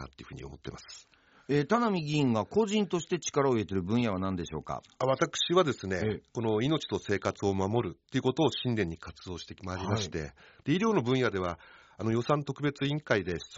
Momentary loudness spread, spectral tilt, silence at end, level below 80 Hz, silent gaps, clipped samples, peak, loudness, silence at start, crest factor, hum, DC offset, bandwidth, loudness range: 15 LU; -5 dB/octave; 0 s; -60 dBFS; none; under 0.1%; -10 dBFS; -30 LUFS; 0 s; 20 dB; none; under 0.1%; 8 kHz; 3 LU